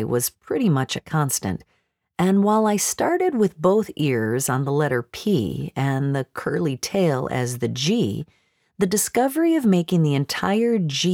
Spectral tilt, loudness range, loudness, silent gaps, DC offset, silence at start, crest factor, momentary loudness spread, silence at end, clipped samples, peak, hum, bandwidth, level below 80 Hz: -5 dB/octave; 3 LU; -22 LUFS; none; under 0.1%; 0 s; 16 dB; 6 LU; 0 s; under 0.1%; -6 dBFS; none; 18.5 kHz; -56 dBFS